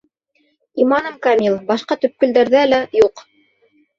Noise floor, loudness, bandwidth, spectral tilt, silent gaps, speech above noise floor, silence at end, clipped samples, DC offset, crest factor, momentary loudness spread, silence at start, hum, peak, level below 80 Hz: -63 dBFS; -16 LUFS; 7.4 kHz; -5.5 dB/octave; none; 48 dB; 0.8 s; under 0.1%; under 0.1%; 16 dB; 7 LU; 0.75 s; none; -2 dBFS; -58 dBFS